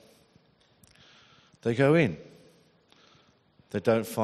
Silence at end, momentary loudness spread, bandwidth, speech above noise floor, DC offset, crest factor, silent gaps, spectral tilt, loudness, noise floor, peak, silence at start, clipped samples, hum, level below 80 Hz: 0 s; 14 LU; 13.5 kHz; 38 dB; under 0.1%; 22 dB; none; -7 dB/octave; -26 LUFS; -63 dBFS; -8 dBFS; 1.65 s; under 0.1%; none; -68 dBFS